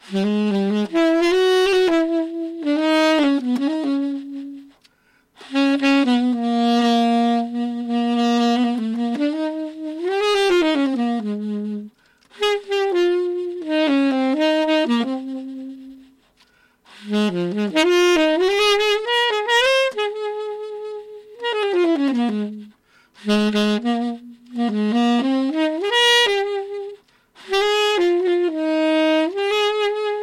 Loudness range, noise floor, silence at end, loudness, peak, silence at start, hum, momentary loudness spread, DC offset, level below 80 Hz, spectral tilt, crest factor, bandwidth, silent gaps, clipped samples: 4 LU; -60 dBFS; 0 s; -19 LUFS; -6 dBFS; 0.05 s; none; 13 LU; under 0.1%; -60 dBFS; -4.5 dB/octave; 14 dB; 15.5 kHz; none; under 0.1%